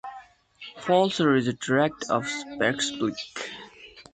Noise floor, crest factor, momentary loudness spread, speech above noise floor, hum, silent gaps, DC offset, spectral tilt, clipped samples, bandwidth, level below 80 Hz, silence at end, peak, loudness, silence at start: -48 dBFS; 18 dB; 20 LU; 23 dB; none; none; under 0.1%; -4.5 dB/octave; under 0.1%; 9.4 kHz; -64 dBFS; 0.1 s; -8 dBFS; -25 LUFS; 0.05 s